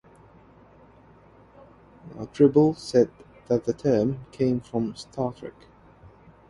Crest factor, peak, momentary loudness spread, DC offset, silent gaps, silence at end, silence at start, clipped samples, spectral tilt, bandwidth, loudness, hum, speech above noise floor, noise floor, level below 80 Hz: 20 dB; -6 dBFS; 20 LU; under 0.1%; none; 1 s; 2.05 s; under 0.1%; -7.5 dB/octave; 11.5 kHz; -24 LUFS; none; 29 dB; -53 dBFS; -58 dBFS